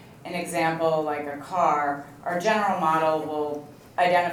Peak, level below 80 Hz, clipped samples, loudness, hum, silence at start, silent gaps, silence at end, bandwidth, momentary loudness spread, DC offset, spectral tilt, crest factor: -8 dBFS; -66 dBFS; under 0.1%; -25 LUFS; none; 0 s; none; 0 s; 19 kHz; 10 LU; under 0.1%; -5 dB/octave; 16 dB